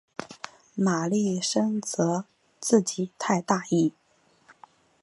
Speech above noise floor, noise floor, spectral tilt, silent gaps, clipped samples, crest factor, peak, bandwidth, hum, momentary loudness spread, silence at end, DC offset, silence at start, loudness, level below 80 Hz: 36 dB; -61 dBFS; -5 dB/octave; none; under 0.1%; 20 dB; -6 dBFS; 11.5 kHz; none; 15 LU; 1.15 s; under 0.1%; 0.2 s; -26 LUFS; -74 dBFS